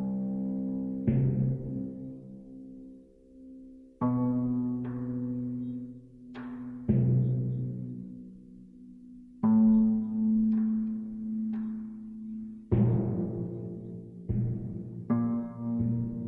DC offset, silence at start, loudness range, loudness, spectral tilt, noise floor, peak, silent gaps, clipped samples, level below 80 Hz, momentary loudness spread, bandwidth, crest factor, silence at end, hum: under 0.1%; 0 s; 6 LU; -30 LUFS; -13 dB/octave; -53 dBFS; -14 dBFS; none; under 0.1%; -52 dBFS; 22 LU; 2.8 kHz; 18 dB; 0 s; none